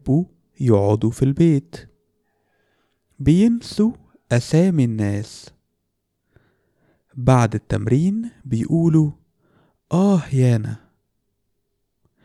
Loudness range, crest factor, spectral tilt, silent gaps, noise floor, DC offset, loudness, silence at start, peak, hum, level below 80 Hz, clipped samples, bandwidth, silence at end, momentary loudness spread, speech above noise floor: 3 LU; 18 dB; -8 dB/octave; none; -74 dBFS; under 0.1%; -19 LUFS; 0.05 s; -2 dBFS; none; -46 dBFS; under 0.1%; 12 kHz; 1.45 s; 13 LU; 56 dB